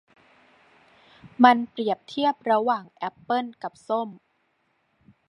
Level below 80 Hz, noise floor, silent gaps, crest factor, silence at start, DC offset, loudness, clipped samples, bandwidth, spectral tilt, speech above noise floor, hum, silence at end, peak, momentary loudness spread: -76 dBFS; -70 dBFS; none; 24 dB; 1.25 s; under 0.1%; -24 LUFS; under 0.1%; 10 kHz; -5.5 dB/octave; 47 dB; none; 1.15 s; -2 dBFS; 17 LU